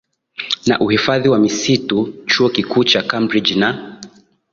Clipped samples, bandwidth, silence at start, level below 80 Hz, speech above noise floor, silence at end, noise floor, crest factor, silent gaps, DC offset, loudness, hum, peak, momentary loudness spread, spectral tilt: under 0.1%; 7.6 kHz; 0.4 s; -54 dBFS; 26 dB; 0.45 s; -41 dBFS; 16 dB; none; under 0.1%; -15 LUFS; none; 0 dBFS; 10 LU; -4.5 dB/octave